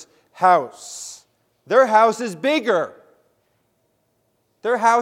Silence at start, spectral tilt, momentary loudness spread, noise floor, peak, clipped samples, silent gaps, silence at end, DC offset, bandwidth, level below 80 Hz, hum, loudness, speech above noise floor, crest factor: 0.4 s; -3.5 dB/octave; 18 LU; -67 dBFS; -2 dBFS; under 0.1%; none; 0 s; under 0.1%; 15 kHz; -76 dBFS; none; -18 LUFS; 50 dB; 20 dB